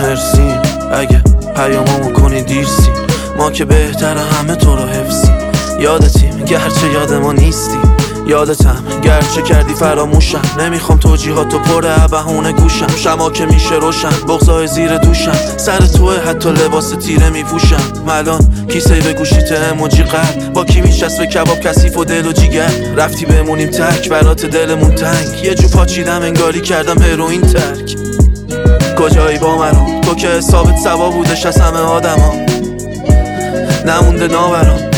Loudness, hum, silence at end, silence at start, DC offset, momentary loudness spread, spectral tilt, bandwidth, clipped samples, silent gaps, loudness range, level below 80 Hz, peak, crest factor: -11 LUFS; none; 0 s; 0 s; under 0.1%; 4 LU; -5.5 dB/octave; 18 kHz; under 0.1%; none; 1 LU; -14 dBFS; 0 dBFS; 10 dB